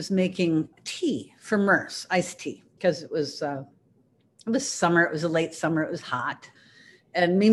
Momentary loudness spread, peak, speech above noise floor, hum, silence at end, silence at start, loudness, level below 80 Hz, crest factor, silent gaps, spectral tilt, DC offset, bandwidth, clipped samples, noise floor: 12 LU; -8 dBFS; 39 dB; none; 0 s; 0 s; -26 LUFS; -70 dBFS; 18 dB; none; -5 dB/octave; under 0.1%; 12.5 kHz; under 0.1%; -64 dBFS